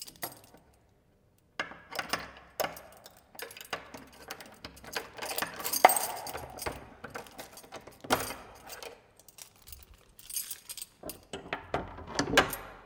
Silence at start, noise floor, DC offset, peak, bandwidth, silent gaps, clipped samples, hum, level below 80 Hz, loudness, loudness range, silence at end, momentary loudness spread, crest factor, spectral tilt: 0 s; -66 dBFS; under 0.1%; -2 dBFS; 18 kHz; none; under 0.1%; none; -58 dBFS; -33 LUFS; 10 LU; 0 s; 23 LU; 34 dB; -2 dB/octave